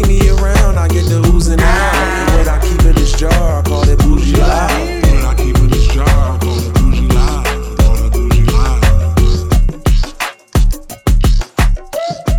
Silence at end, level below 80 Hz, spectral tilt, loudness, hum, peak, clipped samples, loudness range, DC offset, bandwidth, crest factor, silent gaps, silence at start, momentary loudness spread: 0 s; -12 dBFS; -5.5 dB/octave; -13 LUFS; none; 0 dBFS; under 0.1%; 2 LU; under 0.1%; 16 kHz; 10 dB; none; 0 s; 5 LU